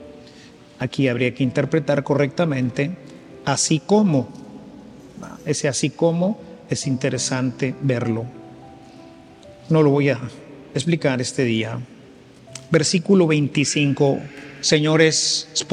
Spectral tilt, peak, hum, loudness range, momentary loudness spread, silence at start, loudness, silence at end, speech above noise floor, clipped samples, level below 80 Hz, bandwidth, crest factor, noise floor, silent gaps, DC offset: -4.5 dB/octave; -2 dBFS; none; 5 LU; 19 LU; 0 s; -20 LUFS; 0 s; 26 dB; under 0.1%; -58 dBFS; 11 kHz; 20 dB; -45 dBFS; none; under 0.1%